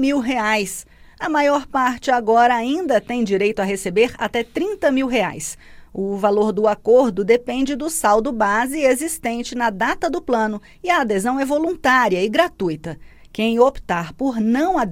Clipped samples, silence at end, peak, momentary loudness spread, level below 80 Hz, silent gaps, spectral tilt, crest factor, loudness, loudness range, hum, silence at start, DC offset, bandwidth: under 0.1%; 0 s; -2 dBFS; 10 LU; -46 dBFS; none; -4.5 dB/octave; 16 dB; -19 LUFS; 2 LU; none; 0 s; under 0.1%; 16.5 kHz